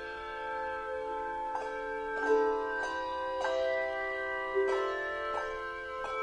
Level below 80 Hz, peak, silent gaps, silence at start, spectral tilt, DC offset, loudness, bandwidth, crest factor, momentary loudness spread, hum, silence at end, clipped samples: -58 dBFS; -16 dBFS; none; 0 s; -3.5 dB/octave; under 0.1%; -34 LUFS; 10.5 kHz; 16 dB; 8 LU; none; 0 s; under 0.1%